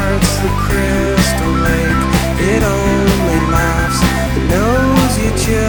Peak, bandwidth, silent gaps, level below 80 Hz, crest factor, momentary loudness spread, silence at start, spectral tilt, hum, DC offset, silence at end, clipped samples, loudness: 0 dBFS; over 20 kHz; none; -20 dBFS; 12 dB; 2 LU; 0 s; -5 dB/octave; none; under 0.1%; 0 s; under 0.1%; -13 LUFS